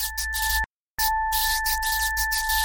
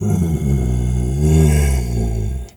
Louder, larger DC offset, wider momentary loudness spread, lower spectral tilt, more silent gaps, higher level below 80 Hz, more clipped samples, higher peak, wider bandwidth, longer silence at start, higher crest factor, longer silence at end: second, -23 LUFS vs -17 LUFS; neither; second, 4 LU vs 7 LU; second, 1.5 dB/octave vs -7 dB/octave; first, 0.66-0.97 s vs none; second, -36 dBFS vs -20 dBFS; neither; second, -10 dBFS vs -2 dBFS; second, 17 kHz vs 19 kHz; about the same, 0 s vs 0 s; about the same, 14 dB vs 14 dB; about the same, 0 s vs 0.05 s